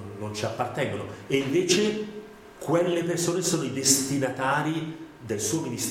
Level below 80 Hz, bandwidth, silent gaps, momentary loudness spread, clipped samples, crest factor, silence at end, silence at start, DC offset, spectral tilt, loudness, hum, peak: -62 dBFS; 17 kHz; none; 15 LU; under 0.1%; 20 dB; 0 s; 0 s; under 0.1%; -3.5 dB/octave; -26 LUFS; none; -6 dBFS